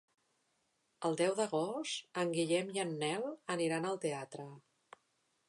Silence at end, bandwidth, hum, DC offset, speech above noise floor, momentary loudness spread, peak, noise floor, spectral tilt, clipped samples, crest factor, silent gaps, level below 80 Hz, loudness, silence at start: 0.9 s; 11.5 kHz; none; under 0.1%; 43 dB; 8 LU; -22 dBFS; -79 dBFS; -4.5 dB/octave; under 0.1%; 18 dB; none; -88 dBFS; -36 LUFS; 1 s